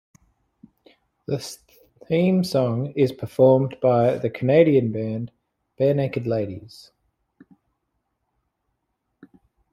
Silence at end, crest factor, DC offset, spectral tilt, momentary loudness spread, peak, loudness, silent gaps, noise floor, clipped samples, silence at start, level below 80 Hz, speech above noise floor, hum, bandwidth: 3.05 s; 20 dB; under 0.1%; -7.5 dB/octave; 15 LU; -2 dBFS; -21 LUFS; none; -76 dBFS; under 0.1%; 1.3 s; -62 dBFS; 56 dB; none; 15 kHz